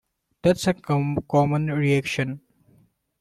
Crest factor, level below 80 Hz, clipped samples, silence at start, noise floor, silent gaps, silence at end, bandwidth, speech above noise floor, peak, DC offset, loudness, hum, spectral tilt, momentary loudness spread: 18 dB; -54 dBFS; under 0.1%; 0.45 s; -61 dBFS; none; 0.8 s; 13.5 kHz; 39 dB; -6 dBFS; under 0.1%; -23 LUFS; none; -6.5 dB/octave; 6 LU